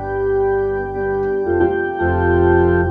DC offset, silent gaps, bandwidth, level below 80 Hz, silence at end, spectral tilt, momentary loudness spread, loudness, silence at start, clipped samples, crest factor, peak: under 0.1%; none; 3.7 kHz; -32 dBFS; 0 s; -10.5 dB/octave; 7 LU; -17 LUFS; 0 s; under 0.1%; 14 dB; -2 dBFS